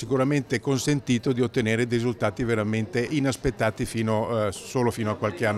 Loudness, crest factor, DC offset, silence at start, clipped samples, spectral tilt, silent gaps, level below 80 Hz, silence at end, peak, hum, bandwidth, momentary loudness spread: -25 LUFS; 14 dB; under 0.1%; 0 s; under 0.1%; -6 dB/octave; none; -48 dBFS; 0 s; -12 dBFS; none; 15 kHz; 3 LU